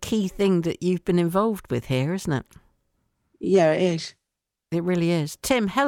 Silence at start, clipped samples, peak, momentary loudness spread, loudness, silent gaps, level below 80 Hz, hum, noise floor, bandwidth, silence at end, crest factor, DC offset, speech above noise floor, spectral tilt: 0 s; under 0.1%; -8 dBFS; 10 LU; -24 LUFS; none; -52 dBFS; none; -84 dBFS; 17 kHz; 0 s; 16 dB; under 0.1%; 61 dB; -6 dB/octave